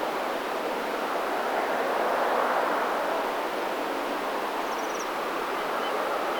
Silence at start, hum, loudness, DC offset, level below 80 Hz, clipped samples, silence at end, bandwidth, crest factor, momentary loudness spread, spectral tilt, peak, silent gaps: 0 s; none; -28 LUFS; under 0.1%; -62 dBFS; under 0.1%; 0 s; over 20 kHz; 16 dB; 4 LU; -2.5 dB/octave; -12 dBFS; none